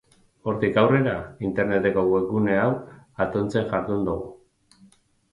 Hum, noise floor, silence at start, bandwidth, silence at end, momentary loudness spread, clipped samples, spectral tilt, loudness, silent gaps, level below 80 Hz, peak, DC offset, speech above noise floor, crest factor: none; -57 dBFS; 0.45 s; 11 kHz; 0.95 s; 12 LU; under 0.1%; -8 dB/octave; -24 LUFS; none; -50 dBFS; -6 dBFS; under 0.1%; 34 dB; 18 dB